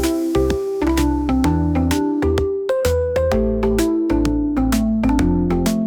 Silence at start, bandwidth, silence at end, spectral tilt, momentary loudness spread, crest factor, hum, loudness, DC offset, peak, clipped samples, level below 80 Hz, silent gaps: 0 s; 19.5 kHz; 0 s; -6.5 dB/octave; 2 LU; 12 dB; none; -18 LUFS; under 0.1%; -6 dBFS; under 0.1%; -26 dBFS; none